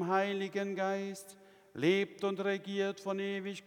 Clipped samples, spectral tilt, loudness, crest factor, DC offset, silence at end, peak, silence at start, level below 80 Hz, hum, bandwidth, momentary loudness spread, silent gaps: under 0.1%; -5.5 dB/octave; -35 LUFS; 18 dB; under 0.1%; 0.05 s; -16 dBFS; 0 s; -84 dBFS; none; 16 kHz; 12 LU; none